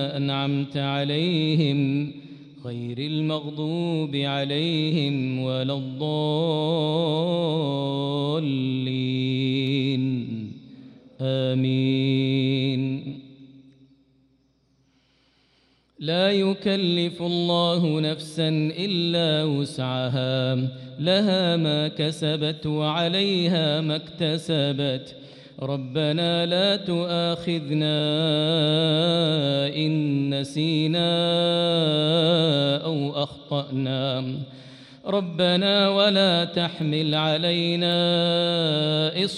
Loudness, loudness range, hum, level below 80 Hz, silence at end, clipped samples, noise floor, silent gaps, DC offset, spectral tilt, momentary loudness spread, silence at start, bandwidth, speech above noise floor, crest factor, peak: -23 LUFS; 5 LU; none; -66 dBFS; 0 s; under 0.1%; -65 dBFS; none; under 0.1%; -6.5 dB/octave; 8 LU; 0 s; 11.5 kHz; 42 dB; 16 dB; -8 dBFS